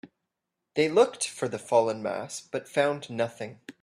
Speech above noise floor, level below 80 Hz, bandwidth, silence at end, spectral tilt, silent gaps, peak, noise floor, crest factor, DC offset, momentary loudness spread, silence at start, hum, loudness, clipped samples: 57 dB; -74 dBFS; 14 kHz; 0.1 s; -4 dB/octave; none; -8 dBFS; -84 dBFS; 20 dB; under 0.1%; 12 LU; 0.05 s; none; -28 LUFS; under 0.1%